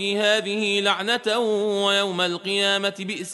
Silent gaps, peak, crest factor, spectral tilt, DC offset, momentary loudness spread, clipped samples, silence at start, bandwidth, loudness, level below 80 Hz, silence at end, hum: none; -6 dBFS; 18 dB; -3 dB/octave; under 0.1%; 3 LU; under 0.1%; 0 s; 11.5 kHz; -21 LUFS; -76 dBFS; 0 s; none